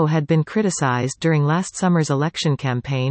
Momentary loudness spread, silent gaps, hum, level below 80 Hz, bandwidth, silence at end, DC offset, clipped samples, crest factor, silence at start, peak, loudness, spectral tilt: 4 LU; none; none; -56 dBFS; 8.8 kHz; 0 s; under 0.1%; under 0.1%; 14 dB; 0 s; -6 dBFS; -20 LUFS; -6 dB/octave